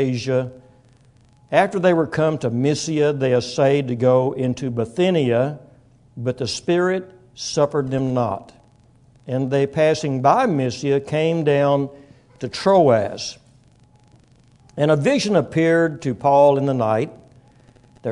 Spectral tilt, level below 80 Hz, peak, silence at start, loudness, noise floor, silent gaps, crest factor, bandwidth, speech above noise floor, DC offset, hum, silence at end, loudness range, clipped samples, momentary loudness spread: -6 dB/octave; -58 dBFS; -2 dBFS; 0 s; -19 LUFS; -53 dBFS; none; 18 dB; 11 kHz; 34 dB; under 0.1%; none; 0 s; 4 LU; under 0.1%; 11 LU